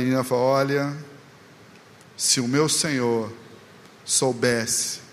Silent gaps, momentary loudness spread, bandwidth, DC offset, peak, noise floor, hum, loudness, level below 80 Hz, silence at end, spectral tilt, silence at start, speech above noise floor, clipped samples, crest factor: none; 9 LU; 15.5 kHz; under 0.1%; -6 dBFS; -49 dBFS; none; -22 LUFS; -66 dBFS; 0.05 s; -3.5 dB/octave; 0 s; 26 dB; under 0.1%; 18 dB